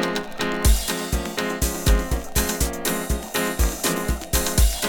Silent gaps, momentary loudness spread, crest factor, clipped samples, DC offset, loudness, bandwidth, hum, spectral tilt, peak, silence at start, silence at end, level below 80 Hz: none; 5 LU; 18 dB; under 0.1%; under 0.1%; -23 LUFS; 19 kHz; none; -3.5 dB/octave; -4 dBFS; 0 s; 0 s; -24 dBFS